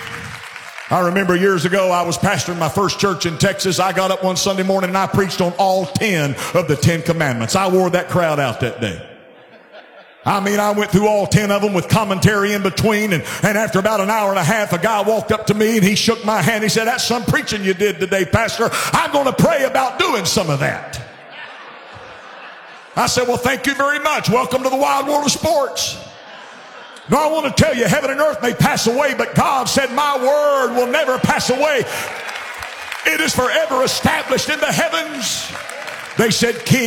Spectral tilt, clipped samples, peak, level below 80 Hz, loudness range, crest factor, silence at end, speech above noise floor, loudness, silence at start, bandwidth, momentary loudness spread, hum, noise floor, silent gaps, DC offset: -4 dB/octave; under 0.1%; 0 dBFS; -48 dBFS; 3 LU; 18 dB; 0 s; 27 dB; -16 LUFS; 0 s; 17 kHz; 13 LU; none; -43 dBFS; none; under 0.1%